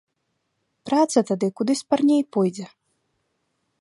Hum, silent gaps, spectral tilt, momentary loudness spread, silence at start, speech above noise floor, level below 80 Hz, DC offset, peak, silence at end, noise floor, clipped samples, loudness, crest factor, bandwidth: none; none; -5.5 dB/octave; 17 LU; 0.85 s; 54 dB; -72 dBFS; under 0.1%; -4 dBFS; 1.15 s; -75 dBFS; under 0.1%; -22 LUFS; 20 dB; 11.5 kHz